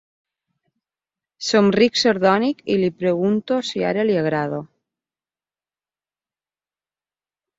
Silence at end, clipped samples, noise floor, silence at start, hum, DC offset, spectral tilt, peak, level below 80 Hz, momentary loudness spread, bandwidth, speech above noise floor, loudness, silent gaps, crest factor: 2.95 s; under 0.1%; under -90 dBFS; 1.4 s; 50 Hz at -45 dBFS; under 0.1%; -5 dB/octave; -4 dBFS; -64 dBFS; 8 LU; 8 kHz; over 71 dB; -19 LUFS; none; 20 dB